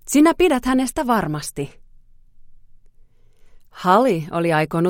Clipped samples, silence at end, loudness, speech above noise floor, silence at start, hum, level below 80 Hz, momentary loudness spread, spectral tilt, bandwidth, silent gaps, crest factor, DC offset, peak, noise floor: under 0.1%; 0 s; -18 LUFS; 31 dB; 0.05 s; none; -44 dBFS; 12 LU; -5.5 dB/octave; 16.5 kHz; none; 18 dB; under 0.1%; -2 dBFS; -49 dBFS